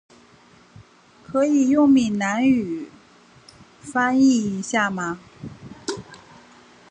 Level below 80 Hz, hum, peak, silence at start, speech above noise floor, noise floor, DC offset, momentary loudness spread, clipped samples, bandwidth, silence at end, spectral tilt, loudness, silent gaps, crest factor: -60 dBFS; none; -6 dBFS; 1.3 s; 33 dB; -52 dBFS; under 0.1%; 21 LU; under 0.1%; 9.8 kHz; 0.75 s; -5 dB/octave; -20 LUFS; none; 16 dB